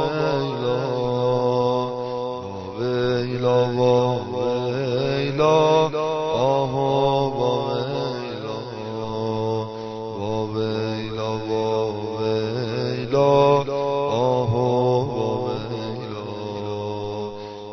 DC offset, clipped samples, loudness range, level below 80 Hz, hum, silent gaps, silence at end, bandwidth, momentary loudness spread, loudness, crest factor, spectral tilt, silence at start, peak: under 0.1%; under 0.1%; 6 LU; -52 dBFS; none; none; 0 s; 6.4 kHz; 11 LU; -23 LUFS; 16 dB; -7 dB/octave; 0 s; -6 dBFS